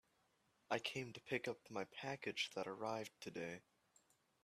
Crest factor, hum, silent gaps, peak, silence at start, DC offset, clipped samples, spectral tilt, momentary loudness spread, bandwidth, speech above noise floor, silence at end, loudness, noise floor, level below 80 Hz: 24 dB; none; none; -24 dBFS; 0.7 s; under 0.1%; under 0.1%; -4 dB/octave; 7 LU; 13.5 kHz; 34 dB; 0.85 s; -46 LUFS; -80 dBFS; -86 dBFS